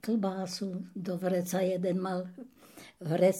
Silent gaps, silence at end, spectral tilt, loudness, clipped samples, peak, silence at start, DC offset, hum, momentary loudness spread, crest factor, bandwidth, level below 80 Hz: none; 0 s; -6 dB/octave; -33 LUFS; under 0.1%; -12 dBFS; 0.05 s; under 0.1%; none; 20 LU; 18 dB; 16.5 kHz; -80 dBFS